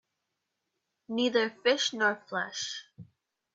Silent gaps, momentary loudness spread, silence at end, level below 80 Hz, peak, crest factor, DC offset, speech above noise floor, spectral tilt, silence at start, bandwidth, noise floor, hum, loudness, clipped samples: none; 10 LU; 0.5 s; -80 dBFS; -12 dBFS; 22 dB; under 0.1%; 53 dB; -2.5 dB/octave; 1.1 s; 7.8 kHz; -84 dBFS; none; -29 LUFS; under 0.1%